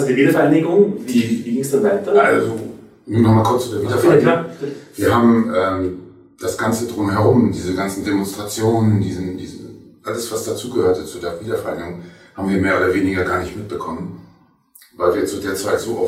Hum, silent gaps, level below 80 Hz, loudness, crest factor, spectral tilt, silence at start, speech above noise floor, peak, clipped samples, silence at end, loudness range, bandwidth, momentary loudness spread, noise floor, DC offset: none; none; -50 dBFS; -18 LUFS; 16 dB; -6 dB/octave; 0 s; 34 dB; -2 dBFS; under 0.1%; 0 s; 6 LU; 16 kHz; 15 LU; -51 dBFS; under 0.1%